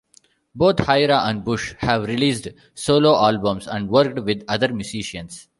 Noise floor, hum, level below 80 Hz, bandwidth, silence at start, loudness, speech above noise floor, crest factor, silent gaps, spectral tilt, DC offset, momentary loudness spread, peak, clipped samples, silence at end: -57 dBFS; none; -48 dBFS; 11.5 kHz; 0.55 s; -20 LUFS; 37 dB; 18 dB; none; -5 dB/octave; under 0.1%; 12 LU; -2 dBFS; under 0.1%; 0.2 s